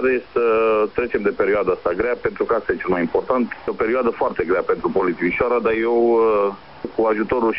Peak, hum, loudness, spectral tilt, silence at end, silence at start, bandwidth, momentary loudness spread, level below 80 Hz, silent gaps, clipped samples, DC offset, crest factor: -4 dBFS; none; -20 LUFS; -5 dB/octave; 0 s; 0 s; 5.6 kHz; 5 LU; -48 dBFS; none; under 0.1%; 0.4%; 14 dB